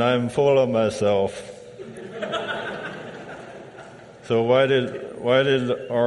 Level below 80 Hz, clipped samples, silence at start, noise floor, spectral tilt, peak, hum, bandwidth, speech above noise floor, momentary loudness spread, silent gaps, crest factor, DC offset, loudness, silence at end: -60 dBFS; under 0.1%; 0 s; -43 dBFS; -6 dB/octave; -6 dBFS; none; 11.5 kHz; 22 dB; 21 LU; none; 16 dB; under 0.1%; -22 LUFS; 0 s